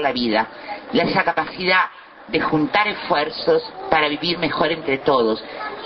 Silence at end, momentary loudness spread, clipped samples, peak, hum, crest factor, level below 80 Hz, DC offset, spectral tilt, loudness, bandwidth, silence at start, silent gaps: 0 s; 7 LU; under 0.1%; 0 dBFS; none; 20 dB; -52 dBFS; under 0.1%; -7 dB/octave; -20 LUFS; 6 kHz; 0 s; none